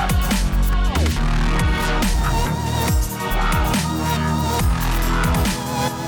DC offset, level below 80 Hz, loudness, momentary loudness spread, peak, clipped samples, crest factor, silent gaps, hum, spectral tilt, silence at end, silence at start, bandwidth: under 0.1%; -22 dBFS; -20 LUFS; 2 LU; -10 dBFS; under 0.1%; 8 dB; none; none; -5 dB/octave; 0 s; 0 s; 19.5 kHz